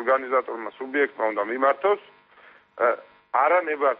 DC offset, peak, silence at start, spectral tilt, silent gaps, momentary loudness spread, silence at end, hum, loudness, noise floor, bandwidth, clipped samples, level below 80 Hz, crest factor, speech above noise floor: under 0.1%; -8 dBFS; 0 s; -1 dB/octave; none; 8 LU; 0.05 s; none; -24 LUFS; -53 dBFS; 4.7 kHz; under 0.1%; -76 dBFS; 16 dB; 30 dB